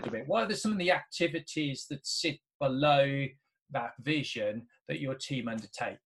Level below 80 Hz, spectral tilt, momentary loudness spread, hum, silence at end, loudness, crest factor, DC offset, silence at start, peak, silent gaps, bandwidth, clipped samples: -70 dBFS; -4.5 dB/octave; 11 LU; none; 0.1 s; -32 LUFS; 20 dB; under 0.1%; 0 s; -14 dBFS; 2.55-2.60 s, 3.62-3.66 s; 12.5 kHz; under 0.1%